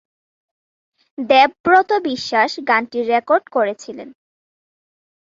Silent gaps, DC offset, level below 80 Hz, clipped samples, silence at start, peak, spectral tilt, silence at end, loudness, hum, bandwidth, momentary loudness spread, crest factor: 1.60-1.64 s; under 0.1%; -64 dBFS; under 0.1%; 1.2 s; 0 dBFS; -3.5 dB/octave; 1.2 s; -16 LUFS; none; 7.8 kHz; 18 LU; 18 dB